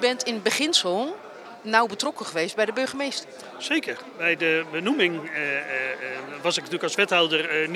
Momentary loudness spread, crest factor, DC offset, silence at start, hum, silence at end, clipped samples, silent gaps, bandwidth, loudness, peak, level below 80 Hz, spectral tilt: 12 LU; 22 dB; under 0.1%; 0 s; none; 0 s; under 0.1%; none; 15.5 kHz; -24 LUFS; -2 dBFS; -82 dBFS; -2.5 dB/octave